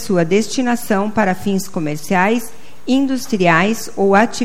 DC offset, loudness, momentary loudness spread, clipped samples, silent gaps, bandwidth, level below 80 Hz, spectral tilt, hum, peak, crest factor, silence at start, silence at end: 5%; -16 LUFS; 8 LU; under 0.1%; none; 16.5 kHz; -52 dBFS; -5 dB/octave; none; 0 dBFS; 16 dB; 0 s; 0 s